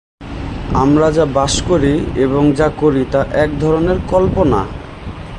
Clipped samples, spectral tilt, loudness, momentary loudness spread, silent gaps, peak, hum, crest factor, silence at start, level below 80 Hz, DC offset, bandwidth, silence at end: under 0.1%; -6 dB/octave; -14 LUFS; 14 LU; none; 0 dBFS; none; 14 dB; 0.2 s; -28 dBFS; under 0.1%; 11 kHz; 0 s